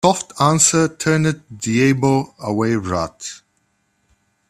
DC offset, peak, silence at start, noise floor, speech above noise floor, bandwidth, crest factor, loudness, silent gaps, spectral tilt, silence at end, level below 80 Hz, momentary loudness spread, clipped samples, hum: under 0.1%; 0 dBFS; 0.05 s; -66 dBFS; 48 dB; 14.5 kHz; 18 dB; -17 LUFS; none; -4.5 dB/octave; 1.15 s; -52 dBFS; 13 LU; under 0.1%; none